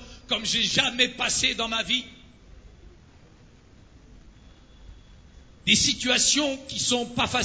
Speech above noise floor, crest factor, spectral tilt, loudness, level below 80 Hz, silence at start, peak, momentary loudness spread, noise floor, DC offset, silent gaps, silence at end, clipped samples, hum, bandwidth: 28 dB; 22 dB; -1.5 dB/octave; -22 LUFS; -50 dBFS; 0 s; -6 dBFS; 8 LU; -53 dBFS; under 0.1%; none; 0 s; under 0.1%; none; 8 kHz